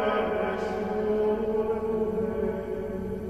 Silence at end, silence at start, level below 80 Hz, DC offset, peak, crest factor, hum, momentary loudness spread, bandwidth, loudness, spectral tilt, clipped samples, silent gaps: 0 s; 0 s; -48 dBFS; 0.2%; -14 dBFS; 12 dB; none; 6 LU; 12.5 kHz; -28 LUFS; -7.5 dB/octave; under 0.1%; none